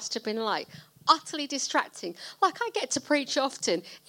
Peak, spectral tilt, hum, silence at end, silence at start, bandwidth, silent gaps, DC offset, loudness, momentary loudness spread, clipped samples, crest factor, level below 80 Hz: -6 dBFS; -1.5 dB/octave; none; 0.1 s; 0 s; 17 kHz; none; under 0.1%; -28 LUFS; 10 LU; under 0.1%; 24 dB; -78 dBFS